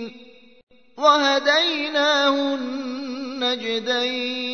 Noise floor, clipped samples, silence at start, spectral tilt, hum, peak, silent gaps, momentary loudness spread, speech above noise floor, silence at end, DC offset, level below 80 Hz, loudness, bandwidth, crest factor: -48 dBFS; under 0.1%; 0 s; -1.5 dB/octave; none; -4 dBFS; 0.63-0.67 s; 12 LU; 27 dB; 0 s; 0.2%; -70 dBFS; -20 LUFS; 6.6 kHz; 18 dB